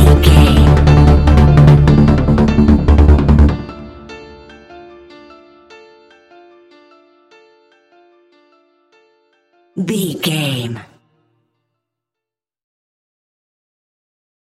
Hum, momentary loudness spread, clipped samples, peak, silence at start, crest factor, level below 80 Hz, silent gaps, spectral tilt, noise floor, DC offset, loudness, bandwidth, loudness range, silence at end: none; 23 LU; under 0.1%; 0 dBFS; 0 s; 14 dB; -18 dBFS; none; -7.5 dB/octave; -86 dBFS; under 0.1%; -11 LUFS; 13.5 kHz; 18 LU; 3.6 s